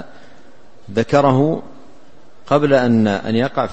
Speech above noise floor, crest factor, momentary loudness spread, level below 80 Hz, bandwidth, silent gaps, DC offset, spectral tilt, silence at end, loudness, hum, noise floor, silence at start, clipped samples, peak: 33 dB; 18 dB; 8 LU; -52 dBFS; 8.4 kHz; none; 2%; -7.5 dB/octave; 0 s; -16 LUFS; none; -48 dBFS; 0 s; under 0.1%; 0 dBFS